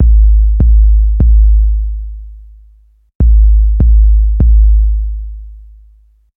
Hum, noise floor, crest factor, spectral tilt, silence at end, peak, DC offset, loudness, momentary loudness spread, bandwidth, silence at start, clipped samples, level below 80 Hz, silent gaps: none; -45 dBFS; 8 dB; -13.5 dB/octave; 0.8 s; -2 dBFS; under 0.1%; -11 LUFS; 16 LU; 0.8 kHz; 0 s; under 0.1%; -8 dBFS; 3.15-3.20 s